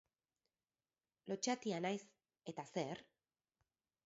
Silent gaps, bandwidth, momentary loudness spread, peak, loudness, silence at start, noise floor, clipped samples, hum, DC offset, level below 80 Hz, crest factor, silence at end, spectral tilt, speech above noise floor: none; 7.6 kHz; 13 LU; -26 dBFS; -44 LUFS; 1.25 s; under -90 dBFS; under 0.1%; none; under 0.1%; -88 dBFS; 22 dB; 1.05 s; -4 dB/octave; over 47 dB